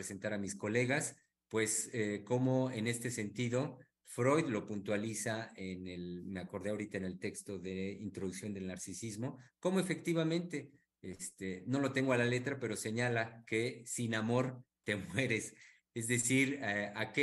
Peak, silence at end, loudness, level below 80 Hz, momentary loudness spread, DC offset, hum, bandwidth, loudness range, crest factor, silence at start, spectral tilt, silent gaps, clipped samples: -18 dBFS; 0 s; -37 LUFS; -76 dBFS; 11 LU; under 0.1%; none; 12.5 kHz; 6 LU; 20 dB; 0 s; -4.5 dB/octave; none; under 0.1%